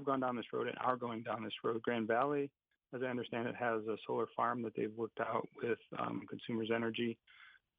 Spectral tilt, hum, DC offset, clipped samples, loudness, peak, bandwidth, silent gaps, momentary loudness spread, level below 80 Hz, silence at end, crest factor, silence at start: -8.5 dB/octave; none; under 0.1%; under 0.1%; -39 LUFS; -18 dBFS; 4.8 kHz; none; 6 LU; -84 dBFS; 0.25 s; 20 dB; 0 s